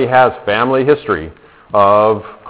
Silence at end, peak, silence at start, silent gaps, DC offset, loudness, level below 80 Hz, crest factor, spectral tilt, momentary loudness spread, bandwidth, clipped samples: 0 s; 0 dBFS; 0 s; none; under 0.1%; -13 LUFS; -44 dBFS; 14 dB; -9.5 dB/octave; 10 LU; 4 kHz; 0.2%